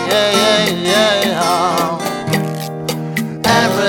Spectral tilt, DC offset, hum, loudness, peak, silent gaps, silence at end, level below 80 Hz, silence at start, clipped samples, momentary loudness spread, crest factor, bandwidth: -3.5 dB/octave; under 0.1%; none; -15 LUFS; 0 dBFS; none; 0 s; -50 dBFS; 0 s; under 0.1%; 10 LU; 14 dB; over 20 kHz